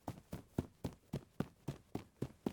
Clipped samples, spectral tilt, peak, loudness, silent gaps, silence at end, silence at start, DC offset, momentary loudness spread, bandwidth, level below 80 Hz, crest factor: under 0.1%; -7.5 dB/octave; -22 dBFS; -48 LUFS; none; 0 s; 0.05 s; under 0.1%; 5 LU; over 20 kHz; -62 dBFS; 24 dB